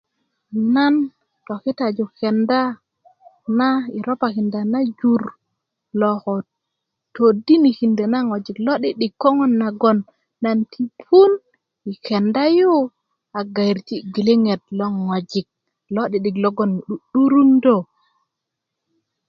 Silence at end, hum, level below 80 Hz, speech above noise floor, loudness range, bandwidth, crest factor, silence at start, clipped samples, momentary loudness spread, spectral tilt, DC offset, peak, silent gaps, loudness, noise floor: 1.45 s; none; -66 dBFS; 63 dB; 4 LU; 6.8 kHz; 18 dB; 0.5 s; under 0.1%; 13 LU; -8 dB/octave; under 0.1%; 0 dBFS; none; -19 LUFS; -81 dBFS